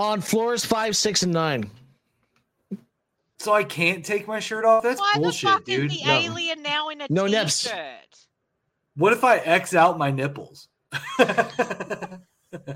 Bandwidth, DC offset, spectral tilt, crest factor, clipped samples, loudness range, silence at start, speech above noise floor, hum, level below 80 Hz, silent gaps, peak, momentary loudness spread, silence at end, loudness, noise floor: 16.5 kHz; under 0.1%; -3.5 dB/octave; 20 dB; under 0.1%; 4 LU; 0 s; 54 dB; none; -66 dBFS; none; -4 dBFS; 15 LU; 0 s; -22 LUFS; -76 dBFS